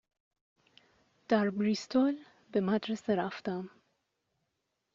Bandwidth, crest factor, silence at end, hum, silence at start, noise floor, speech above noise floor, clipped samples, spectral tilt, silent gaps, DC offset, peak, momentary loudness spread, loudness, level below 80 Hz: 7.6 kHz; 20 dB; 1.25 s; none; 1.3 s; -83 dBFS; 52 dB; under 0.1%; -5 dB/octave; none; under 0.1%; -14 dBFS; 10 LU; -32 LUFS; -76 dBFS